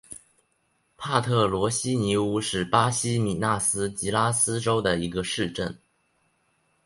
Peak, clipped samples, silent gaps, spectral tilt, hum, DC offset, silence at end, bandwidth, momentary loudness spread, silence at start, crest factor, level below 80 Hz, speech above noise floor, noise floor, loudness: -4 dBFS; under 0.1%; none; -4 dB/octave; none; under 0.1%; 1.1 s; 11.5 kHz; 7 LU; 0.1 s; 22 dB; -52 dBFS; 46 dB; -70 dBFS; -25 LUFS